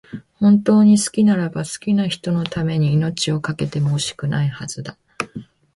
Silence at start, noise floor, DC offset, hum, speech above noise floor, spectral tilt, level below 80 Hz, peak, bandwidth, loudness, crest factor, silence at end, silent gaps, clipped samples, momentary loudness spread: 0.15 s; -37 dBFS; under 0.1%; none; 20 dB; -6 dB/octave; -52 dBFS; -4 dBFS; 11.5 kHz; -18 LUFS; 14 dB; 0.35 s; none; under 0.1%; 16 LU